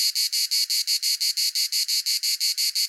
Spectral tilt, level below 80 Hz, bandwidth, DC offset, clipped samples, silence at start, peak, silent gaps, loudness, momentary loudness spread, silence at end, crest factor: 14 dB/octave; under -90 dBFS; 17 kHz; under 0.1%; under 0.1%; 0 s; -10 dBFS; none; -21 LUFS; 1 LU; 0 s; 14 dB